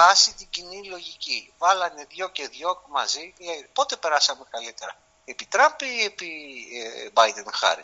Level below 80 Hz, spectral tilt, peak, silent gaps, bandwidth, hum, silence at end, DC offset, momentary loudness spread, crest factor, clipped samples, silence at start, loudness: -68 dBFS; 3.5 dB/octave; -2 dBFS; none; 8 kHz; none; 0 s; under 0.1%; 16 LU; 22 dB; under 0.1%; 0 s; -24 LUFS